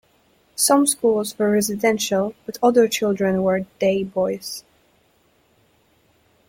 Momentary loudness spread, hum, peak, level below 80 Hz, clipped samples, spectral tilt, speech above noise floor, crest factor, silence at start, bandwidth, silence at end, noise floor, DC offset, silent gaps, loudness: 10 LU; none; -4 dBFS; -60 dBFS; under 0.1%; -4 dB/octave; 41 dB; 16 dB; 0.6 s; 16.5 kHz; 1.9 s; -61 dBFS; under 0.1%; none; -20 LUFS